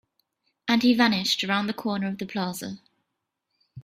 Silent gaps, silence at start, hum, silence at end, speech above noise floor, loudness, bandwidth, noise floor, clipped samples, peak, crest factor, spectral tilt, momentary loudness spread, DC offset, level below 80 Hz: none; 0.65 s; none; 0 s; 56 dB; -24 LUFS; 15.5 kHz; -81 dBFS; under 0.1%; -6 dBFS; 22 dB; -4 dB/octave; 15 LU; under 0.1%; -66 dBFS